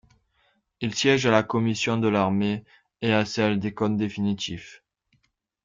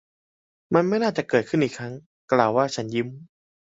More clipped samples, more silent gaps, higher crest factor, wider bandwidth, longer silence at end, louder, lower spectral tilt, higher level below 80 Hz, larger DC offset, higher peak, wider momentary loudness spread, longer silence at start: neither; second, none vs 2.06-2.28 s; about the same, 20 dB vs 22 dB; about the same, 7.6 kHz vs 8 kHz; first, 0.9 s vs 0.55 s; about the same, -24 LUFS vs -23 LUFS; about the same, -5.5 dB/octave vs -6 dB/octave; about the same, -60 dBFS vs -64 dBFS; neither; second, -6 dBFS vs -2 dBFS; second, 10 LU vs 14 LU; about the same, 0.8 s vs 0.7 s